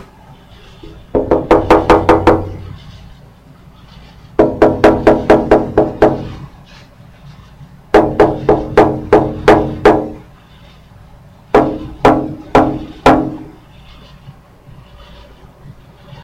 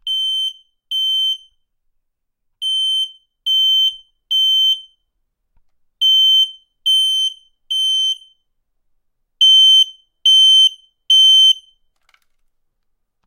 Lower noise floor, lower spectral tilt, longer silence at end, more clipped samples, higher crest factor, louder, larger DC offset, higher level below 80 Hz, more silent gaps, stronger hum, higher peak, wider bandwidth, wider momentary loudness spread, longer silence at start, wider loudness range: second, -40 dBFS vs -71 dBFS; first, -7 dB/octave vs 8 dB/octave; second, 0 s vs 1.7 s; first, 0.6% vs under 0.1%; about the same, 14 dB vs 14 dB; about the same, -12 LUFS vs -12 LUFS; neither; first, -30 dBFS vs -68 dBFS; neither; neither; first, 0 dBFS vs -4 dBFS; second, 12.5 kHz vs 16 kHz; about the same, 14 LU vs 14 LU; first, 0.85 s vs 0.05 s; second, 3 LU vs 8 LU